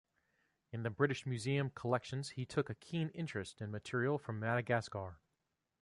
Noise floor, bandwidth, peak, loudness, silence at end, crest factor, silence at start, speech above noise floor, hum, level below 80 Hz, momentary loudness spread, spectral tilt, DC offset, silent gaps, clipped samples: -86 dBFS; 11.5 kHz; -18 dBFS; -39 LUFS; 0.65 s; 22 dB; 0.7 s; 48 dB; none; -68 dBFS; 9 LU; -6 dB/octave; under 0.1%; none; under 0.1%